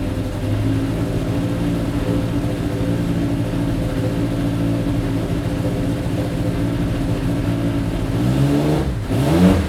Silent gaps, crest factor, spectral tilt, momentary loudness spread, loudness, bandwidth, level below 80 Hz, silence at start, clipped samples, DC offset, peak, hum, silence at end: none; 16 dB; -7.5 dB/octave; 4 LU; -20 LUFS; 15.5 kHz; -30 dBFS; 0 s; under 0.1%; under 0.1%; -2 dBFS; none; 0 s